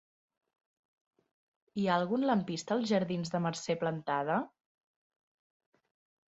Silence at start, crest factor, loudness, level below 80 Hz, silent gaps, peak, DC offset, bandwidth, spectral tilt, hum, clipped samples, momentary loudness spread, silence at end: 1.75 s; 20 dB; -33 LUFS; -76 dBFS; none; -16 dBFS; under 0.1%; 8.2 kHz; -6 dB/octave; none; under 0.1%; 5 LU; 1.8 s